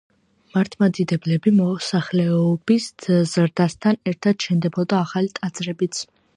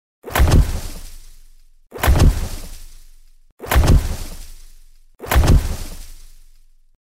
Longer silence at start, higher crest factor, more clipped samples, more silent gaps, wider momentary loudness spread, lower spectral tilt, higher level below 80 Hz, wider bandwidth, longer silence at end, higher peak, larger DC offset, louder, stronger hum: first, 0.55 s vs 0.25 s; about the same, 16 dB vs 14 dB; neither; second, none vs 3.52-3.57 s; second, 7 LU vs 23 LU; about the same, -6.5 dB/octave vs -5.5 dB/octave; second, -62 dBFS vs -20 dBFS; second, 10.5 kHz vs 16 kHz; second, 0.3 s vs 0.9 s; about the same, -4 dBFS vs -4 dBFS; neither; second, -21 LUFS vs -18 LUFS; neither